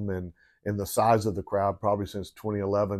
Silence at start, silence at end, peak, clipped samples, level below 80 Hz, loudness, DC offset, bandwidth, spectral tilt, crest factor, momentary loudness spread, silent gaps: 0 s; 0 s; -10 dBFS; under 0.1%; -56 dBFS; -28 LUFS; under 0.1%; 15.5 kHz; -6.5 dB/octave; 18 dB; 12 LU; none